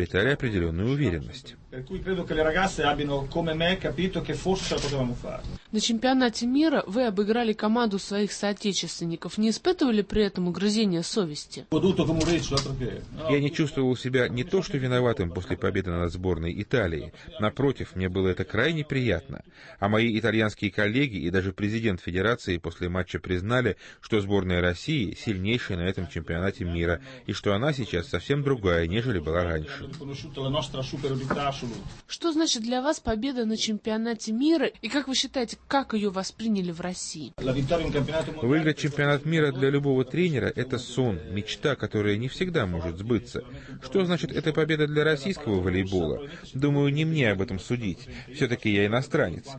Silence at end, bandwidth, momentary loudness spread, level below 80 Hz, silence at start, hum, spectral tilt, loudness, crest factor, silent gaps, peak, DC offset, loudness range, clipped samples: 0 s; 8.8 kHz; 8 LU; -46 dBFS; 0 s; none; -5.5 dB/octave; -27 LUFS; 16 dB; none; -10 dBFS; under 0.1%; 3 LU; under 0.1%